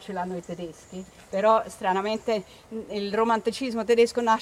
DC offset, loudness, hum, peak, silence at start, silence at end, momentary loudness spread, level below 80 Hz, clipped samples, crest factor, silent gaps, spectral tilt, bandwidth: under 0.1%; -25 LUFS; none; -8 dBFS; 0 s; 0 s; 17 LU; -60 dBFS; under 0.1%; 18 dB; none; -4.5 dB/octave; 13.5 kHz